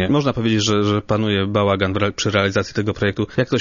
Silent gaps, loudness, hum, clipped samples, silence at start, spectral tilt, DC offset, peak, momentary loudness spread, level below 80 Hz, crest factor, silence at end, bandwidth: none; -19 LUFS; none; under 0.1%; 0 s; -5.5 dB/octave; under 0.1%; -2 dBFS; 4 LU; -46 dBFS; 16 dB; 0 s; 7.4 kHz